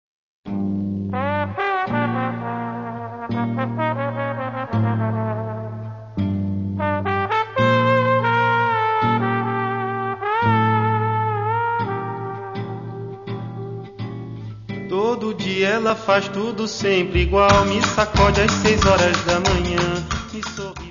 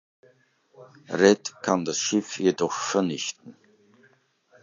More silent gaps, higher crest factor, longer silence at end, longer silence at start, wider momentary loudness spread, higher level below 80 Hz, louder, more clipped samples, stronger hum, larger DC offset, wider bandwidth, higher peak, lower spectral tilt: neither; about the same, 20 dB vs 24 dB; second, 0 s vs 1.1 s; second, 0.45 s vs 0.8 s; first, 15 LU vs 12 LU; first, -36 dBFS vs -68 dBFS; first, -20 LUFS vs -24 LUFS; neither; neither; neither; about the same, 7.4 kHz vs 7.6 kHz; about the same, -2 dBFS vs -4 dBFS; first, -5.5 dB/octave vs -4 dB/octave